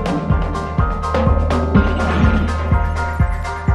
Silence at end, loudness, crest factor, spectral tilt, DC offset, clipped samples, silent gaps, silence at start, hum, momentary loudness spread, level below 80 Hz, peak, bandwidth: 0 s; -18 LUFS; 14 dB; -7.5 dB/octave; under 0.1%; under 0.1%; none; 0 s; none; 4 LU; -20 dBFS; -2 dBFS; 10 kHz